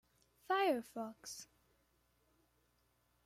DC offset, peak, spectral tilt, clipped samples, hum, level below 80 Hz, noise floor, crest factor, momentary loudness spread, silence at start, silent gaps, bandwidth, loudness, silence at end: under 0.1%; -24 dBFS; -3 dB/octave; under 0.1%; 60 Hz at -75 dBFS; -82 dBFS; -78 dBFS; 20 dB; 17 LU; 0.5 s; none; 16 kHz; -39 LUFS; 1.8 s